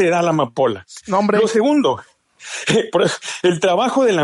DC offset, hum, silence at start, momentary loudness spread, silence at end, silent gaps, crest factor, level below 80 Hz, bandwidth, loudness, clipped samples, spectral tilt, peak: under 0.1%; none; 0 s; 7 LU; 0 s; none; 14 dB; -62 dBFS; 11.5 kHz; -17 LUFS; under 0.1%; -5 dB/octave; -4 dBFS